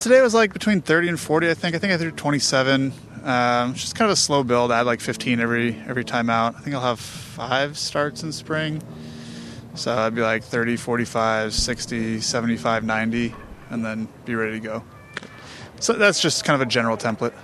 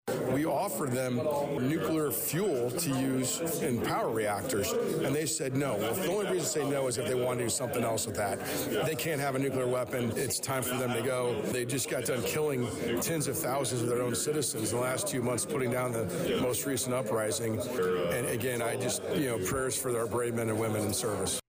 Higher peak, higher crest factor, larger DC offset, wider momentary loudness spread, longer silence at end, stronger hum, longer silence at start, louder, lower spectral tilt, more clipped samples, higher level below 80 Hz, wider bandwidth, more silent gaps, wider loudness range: first, -4 dBFS vs -20 dBFS; first, 18 dB vs 10 dB; neither; first, 15 LU vs 2 LU; about the same, 0 s vs 0.1 s; neither; about the same, 0 s vs 0.05 s; first, -21 LUFS vs -31 LUFS; about the same, -4 dB/octave vs -4.5 dB/octave; neither; first, -48 dBFS vs -60 dBFS; second, 13 kHz vs 16 kHz; neither; first, 6 LU vs 1 LU